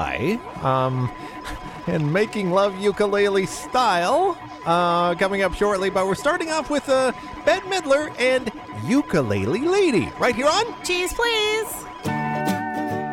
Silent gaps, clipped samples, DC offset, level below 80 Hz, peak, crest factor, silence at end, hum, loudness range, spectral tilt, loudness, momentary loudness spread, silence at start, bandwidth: none; under 0.1%; under 0.1%; -46 dBFS; -8 dBFS; 14 dB; 0 s; none; 2 LU; -5 dB/octave; -21 LUFS; 8 LU; 0 s; 17 kHz